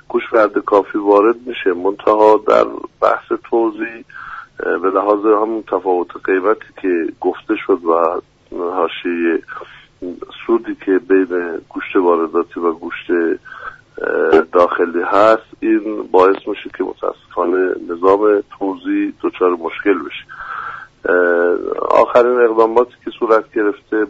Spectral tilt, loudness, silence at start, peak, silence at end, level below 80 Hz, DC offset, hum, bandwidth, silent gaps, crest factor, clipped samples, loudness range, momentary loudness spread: -6 dB/octave; -16 LUFS; 0.1 s; 0 dBFS; 0 s; -54 dBFS; under 0.1%; none; 7.6 kHz; none; 16 dB; under 0.1%; 4 LU; 14 LU